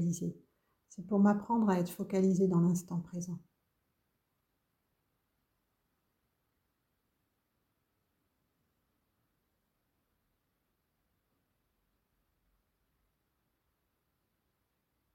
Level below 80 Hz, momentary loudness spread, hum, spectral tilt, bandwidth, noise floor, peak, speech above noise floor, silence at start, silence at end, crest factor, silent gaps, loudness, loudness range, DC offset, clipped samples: -74 dBFS; 13 LU; none; -8 dB/octave; 16.5 kHz; -82 dBFS; -16 dBFS; 51 dB; 0 s; 11.75 s; 22 dB; none; -32 LUFS; 15 LU; under 0.1%; under 0.1%